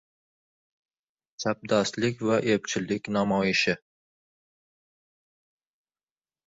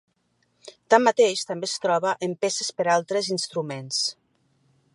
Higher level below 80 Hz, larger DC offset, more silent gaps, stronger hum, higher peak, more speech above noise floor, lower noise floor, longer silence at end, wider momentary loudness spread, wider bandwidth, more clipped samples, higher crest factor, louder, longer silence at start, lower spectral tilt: first, -64 dBFS vs -80 dBFS; neither; neither; neither; second, -10 dBFS vs -2 dBFS; first, over 64 dB vs 46 dB; first, under -90 dBFS vs -70 dBFS; first, 2.7 s vs 0.85 s; about the same, 7 LU vs 9 LU; second, 8 kHz vs 11.5 kHz; neither; about the same, 20 dB vs 22 dB; second, -26 LUFS vs -23 LUFS; first, 1.4 s vs 0.65 s; first, -4.5 dB/octave vs -3 dB/octave